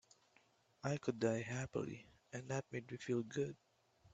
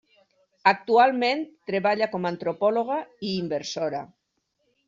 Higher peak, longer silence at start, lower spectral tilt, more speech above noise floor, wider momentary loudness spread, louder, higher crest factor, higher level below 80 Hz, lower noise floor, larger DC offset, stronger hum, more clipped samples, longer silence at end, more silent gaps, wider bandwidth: second, -24 dBFS vs -4 dBFS; first, 0.85 s vs 0.65 s; first, -6 dB/octave vs -3 dB/octave; second, 32 dB vs 51 dB; first, 13 LU vs 10 LU; second, -43 LUFS vs -24 LUFS; about the same, 20 dB vs 22 dB; about the same, -74 dBFS vs -72 dBFS; about the same, -74 dBFS vs -76 dBFS; neither; neither; neither; second, 0.05 s vs 0.8 s; neither; first, 8.8 kHz vs 7.6 kHz